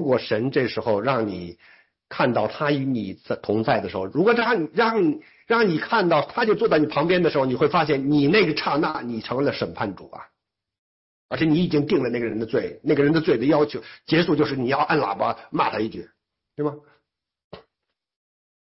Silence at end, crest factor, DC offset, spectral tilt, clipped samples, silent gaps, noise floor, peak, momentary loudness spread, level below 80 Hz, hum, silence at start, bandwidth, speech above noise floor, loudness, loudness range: 1 s; 16 dB; under 0.1%; -9.5 dB/octave; under 0.1%; 10.78-11.29 s, 17.44-17.51 s; -82 dBFS; -6 dBFS; 10 LU; -58 dBFS; none; 0 s; 5.8 kHz; 60 dB; -22 LUFS; 6 LU